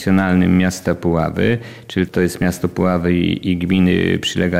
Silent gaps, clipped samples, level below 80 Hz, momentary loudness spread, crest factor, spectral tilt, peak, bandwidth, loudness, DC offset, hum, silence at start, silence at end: none; under 0.1%; -40 dBFS; 6 LU; 12 dB; -6.5 dB/octave; -4 dBFS; 15 kHz; -17 LUFS; 0.5%; none; 0 s; 0 s